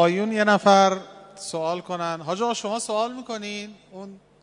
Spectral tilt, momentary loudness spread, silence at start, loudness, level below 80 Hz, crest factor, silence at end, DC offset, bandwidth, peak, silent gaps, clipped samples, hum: -4.5 dB/octave; 24 LU; 0 s; -23 LUFS; -72 dBFS; 20 dB; 0.25 s; under 0.1%; 11 kHz; -2 dBFS; none; under 0.1%; 50 Hz at -65 dBFS